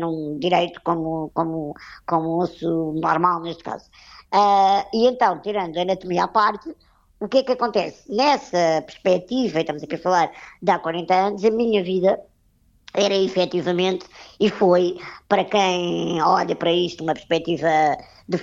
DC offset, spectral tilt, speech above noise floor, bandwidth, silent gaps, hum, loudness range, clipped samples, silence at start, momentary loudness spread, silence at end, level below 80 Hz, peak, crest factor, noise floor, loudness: under 0.1%; -5.5 dB/octave; 39 dB; 7.6 kHz; none; none; 2 LU; under 0.1%; 0 s; 9 LU; 0 s; -58 dBFS; -4 dBFS; 18 dB; -60 dBFS; -21 LUFS